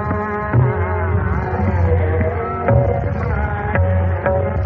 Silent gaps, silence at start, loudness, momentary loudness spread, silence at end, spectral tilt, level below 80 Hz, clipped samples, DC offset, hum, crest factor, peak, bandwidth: none; 0 s; -18 LUFS; 4 LU; 0 s; -9 dB/octave; -30 dBFS; under 0.1%; under 0.1%; none; 14 dB; -2 dBFS; 3.4 kHz